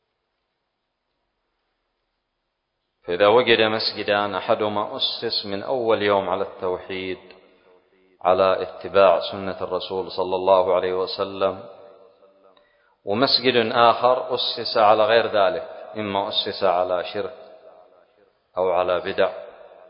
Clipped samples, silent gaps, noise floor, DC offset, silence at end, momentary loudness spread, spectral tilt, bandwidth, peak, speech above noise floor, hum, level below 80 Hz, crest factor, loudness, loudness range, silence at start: under 0.1%; none; -77 dBFS; under 0.1%; 0.25 s; 13 LU; -8.5 dB/octave; 5.4 kHz; -2 dBFS; 56 dB; none; -60 dBFS; 20 dB; -21 LUFS; 6 LU; 3.05 s